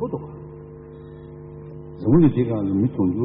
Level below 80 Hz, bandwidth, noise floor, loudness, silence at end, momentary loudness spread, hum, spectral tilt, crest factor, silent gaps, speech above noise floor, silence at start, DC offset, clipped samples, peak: -46 dBFS; 3.9 kHz; -39 dBFS; -20 LUFS; 0 s; 24 LU; 50 Hz at -40 dBFS; -10 dB/octave; 16 dB; none; 21 dB; 0 s; under 0.1%; under 0.1%; -6 dBFS